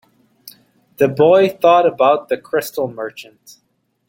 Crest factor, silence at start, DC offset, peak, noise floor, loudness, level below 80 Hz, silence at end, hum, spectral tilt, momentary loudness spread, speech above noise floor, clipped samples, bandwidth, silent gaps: 16 dB; 0.45 s; under 0.1%; -2 dBFS; -48 dBFS; -15 LUFS; -62 dBFS; 0.85 s; none; -5.5 dB/octave; 15 LU; 33 dB; under 0.1%; 17 kHz; none